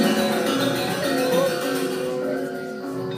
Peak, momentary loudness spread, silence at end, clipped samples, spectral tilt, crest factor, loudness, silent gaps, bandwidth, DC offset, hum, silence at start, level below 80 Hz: -8 dBFS; 9 LU; 0 s; under 0.1%; -4.5 dB/octave; 16 dB; -23 LUFS; none; 15.5 kHz; under 0.1%; none; 0 s; -62 dBFS